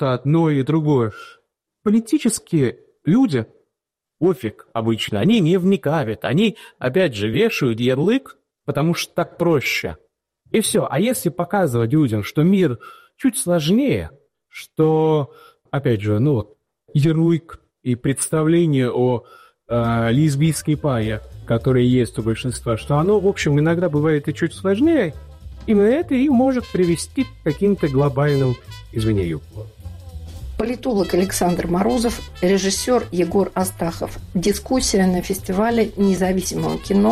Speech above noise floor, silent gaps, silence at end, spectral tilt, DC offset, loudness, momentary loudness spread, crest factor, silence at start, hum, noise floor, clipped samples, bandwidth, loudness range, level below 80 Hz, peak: 64 dB; none; 0 s; -6 dB/octave; under 0.1%; -19 LUFS; 10 LU; 12 dB; 0 s; none; -83 dBFS; under 0.1%; 15 kHz; 3 LU; -42 dBFS; -6 dBFS